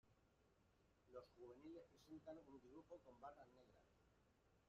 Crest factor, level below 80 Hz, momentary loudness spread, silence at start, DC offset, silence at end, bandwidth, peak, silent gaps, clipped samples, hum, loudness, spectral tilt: 20 dB; -84 dBFS; 5 LU; 0.05 s; under 0.1%; 0 s; 7.2 kHz; -46 dBFS; none; under 0.1%; none; -63 LUFS; -5.5 dB/octave